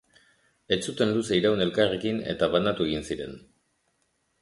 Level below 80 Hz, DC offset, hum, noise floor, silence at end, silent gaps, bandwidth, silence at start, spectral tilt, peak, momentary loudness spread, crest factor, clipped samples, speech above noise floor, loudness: -54 dBFS; under 0.1%; none; -73 dBFS; 1.05 s; none; 11.5 kHz; 0.7 s; -5 dB/octave; -8 dBFS; 8 LU; 20 dB; under 0.1%; 47 dB; -26 LUFS